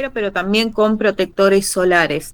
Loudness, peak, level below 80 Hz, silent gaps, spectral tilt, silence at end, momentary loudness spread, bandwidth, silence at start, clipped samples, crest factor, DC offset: -16 LUFS; 0 dBFS; -44 dBFS; none; -4 dB/octave; 0 s; 4 LU; over 20 kHz; 0 s; under 0.1%; 16 dB; under 0.1%